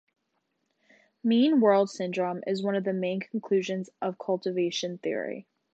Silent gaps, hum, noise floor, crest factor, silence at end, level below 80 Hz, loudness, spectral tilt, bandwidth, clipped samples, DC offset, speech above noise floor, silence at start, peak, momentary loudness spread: none; none; -77 dBFS; 18 dB; 0.35 s; -82 dBFS; -28 LUFS; -6 dB/octave; 8.2 kHz; under 0.1%; under 0.1%; 51 dB; 1.25 s; -10 dBFS; 12 LU